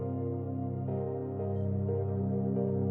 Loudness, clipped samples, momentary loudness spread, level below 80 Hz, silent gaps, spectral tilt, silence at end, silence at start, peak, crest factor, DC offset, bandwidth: -33 LUFS; under 0.1%; 4 LU; -74 dBFS; none; -14 dB/octave; 0 s; 0 s; -20 dBFS; 12 dB; under 0.1%; 2.5 kHz